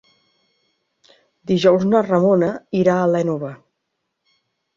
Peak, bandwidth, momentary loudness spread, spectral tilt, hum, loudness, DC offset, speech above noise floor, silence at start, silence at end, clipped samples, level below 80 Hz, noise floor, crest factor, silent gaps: -2 dBFS; 7.4 kHz; 11 LU; -7.5 dB/octave; none; -17 LUFS; under 0.1%; 59 dB; 1.45 s; 1.2 s; under 0.1%; -60 dBFS; -76 dBFS; 18 dB; none